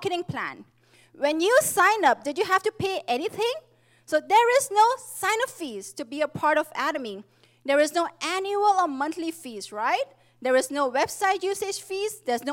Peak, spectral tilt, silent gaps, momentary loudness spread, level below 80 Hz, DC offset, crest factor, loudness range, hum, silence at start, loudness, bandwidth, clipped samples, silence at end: -8 dBFS; -2.5 dB/octave; none; 14 LU; -72 dBFS; under 0.1%; 16 dB; 3 LU; none; 0 s; -24 LUFS; 17 kHz; under 0.1%; 0 s